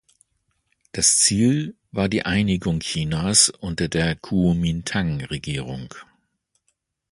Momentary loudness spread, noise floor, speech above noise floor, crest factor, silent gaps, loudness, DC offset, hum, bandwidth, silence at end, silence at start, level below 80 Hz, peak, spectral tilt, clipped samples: 13 LU; -72 dBFS; 51 dB; 20 dB; none; -20 LUFS; under 0.1%; none; 11.5 kHz; 1.1 s; 0.95 s; -42 dBFS; -2 dBFS; -3.5 dB/octave; under 0.1%